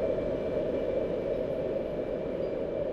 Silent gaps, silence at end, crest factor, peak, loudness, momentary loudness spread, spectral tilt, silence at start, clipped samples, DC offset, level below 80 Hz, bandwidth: none; 0 s; 12 dB; -18 dBFS; -32 LUFS; 3 LU; -8.5 dB/octave; 0 s; under 0.1%; under 0.1%; -48 dBFS; 7.2 kHz